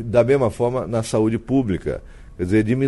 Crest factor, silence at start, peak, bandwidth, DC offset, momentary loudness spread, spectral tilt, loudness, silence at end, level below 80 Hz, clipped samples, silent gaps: 16 dB; 0 s; -4 dBFS; 11.5 kHz; under 0.1%; 11 LU; -7.5 dB/octave; -20 LUFS; 0 s; -40 dBFS; under 0.1%; none